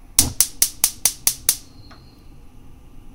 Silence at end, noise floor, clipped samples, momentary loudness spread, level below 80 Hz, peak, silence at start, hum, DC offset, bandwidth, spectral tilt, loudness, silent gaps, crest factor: 0.15 s; -43 dBFS; under 0.1%; 4 LU; -42 dBFS; 0 dBFS; 0.15 s; none; under 0.1%; over 20 kHz; -0.5 dB/octave; -18 LUFS; none; 24 dB